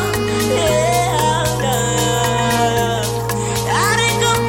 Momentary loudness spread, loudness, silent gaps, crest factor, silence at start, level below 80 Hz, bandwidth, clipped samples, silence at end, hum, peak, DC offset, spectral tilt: 5 LU; -16 LUFS; none; 14 dB; 0 s; -36 dBFS; 17 kHz; under 0.1%; 0 s; none; -2 dBFS; under 0.1%; -4 dB/octave